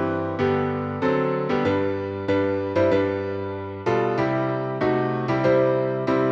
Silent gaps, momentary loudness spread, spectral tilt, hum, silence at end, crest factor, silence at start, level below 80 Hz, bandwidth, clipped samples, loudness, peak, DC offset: none; 6 LU; -8.5 dB/octave; none; 0 s; 14 dB; 0 s; -56 dBFS; 7.2 kHz; under 0.1%; -23 LUFS; -8 dBFS; under 0.1%